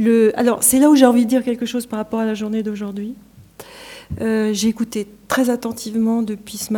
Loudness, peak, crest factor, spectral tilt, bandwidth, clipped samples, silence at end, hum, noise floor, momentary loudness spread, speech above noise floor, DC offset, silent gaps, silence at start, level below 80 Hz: -18 LUFS; 0 dBFS; 18 dB; -4 dB/octave; 19 kHz; under 0.1%; 0 s; none; -41 dBFS; 16 LU; 24 dB; under 0.1%; none; 0 s; -50 dBFS